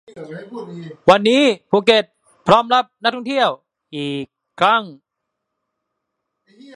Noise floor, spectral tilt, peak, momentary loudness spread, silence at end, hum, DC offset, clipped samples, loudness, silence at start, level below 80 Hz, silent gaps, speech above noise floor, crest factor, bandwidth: -78 dBFS; -5 dB/octave; 0 dBFS; 20 LU; 1.85 s; none; under 0.1%; under 0.1%; -16 LUFS; 0.15 s; -58 dBFS; none; 61 dB; 20 dB; 11 kHz